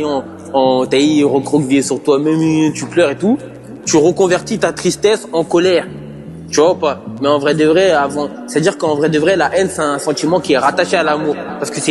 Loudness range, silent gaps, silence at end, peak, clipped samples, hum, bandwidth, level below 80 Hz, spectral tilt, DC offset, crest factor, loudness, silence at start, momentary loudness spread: 1 LU; none; 0 s; 0 dBFS; under 0.1%; none; 12.5 kHz; -52 dBFS; -4.5 dB/octave; under 0.1%; 14 dB; -14 LUFS; 0 s; 8 LU